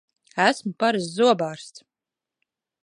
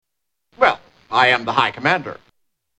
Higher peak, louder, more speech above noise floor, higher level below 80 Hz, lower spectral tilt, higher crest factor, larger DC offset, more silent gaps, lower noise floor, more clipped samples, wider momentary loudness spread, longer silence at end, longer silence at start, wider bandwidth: second, -4 dBFS vs 0 dBFS; second, -22 LUFS vs -17 LUFS; first, 66 dB vs 55 dB; second, -76 dBFS vs -58 dBFS; about the same, -4.5 dB/octave vs -4.5 dB/octave; about the same, 22 dB vs 20 dB; neither; neither; first, -88 dBFS vs -73 dBFS; neither; first, 16 LU vs 10 LU; first, 1.05 s vs 0.65 s; second, 0.35 s vs 0.6 s; first, 11 kHz vs 9.6 kHz